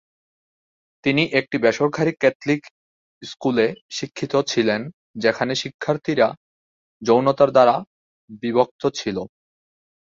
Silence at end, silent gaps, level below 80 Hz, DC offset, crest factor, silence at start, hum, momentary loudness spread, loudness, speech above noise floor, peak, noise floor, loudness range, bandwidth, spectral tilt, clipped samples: 0.8 s; 2.35-2.40 s, 2.71-3.21 s, 3.82-3.89 s, 4.94-5.14 s, 5.74-5.79 s, 6.37-7.00 s, 7.87-8.28 s, 8.71-8.79 s; -62 dBFS; under 0.1%; 20 dB; 1.05 s; none; 13 LU; -21 LUFS; over 70 dB; -2 dBFS; under -90 dBFS; 3 LU; 7.8 kHz; -5 dB/octave; under 0.1%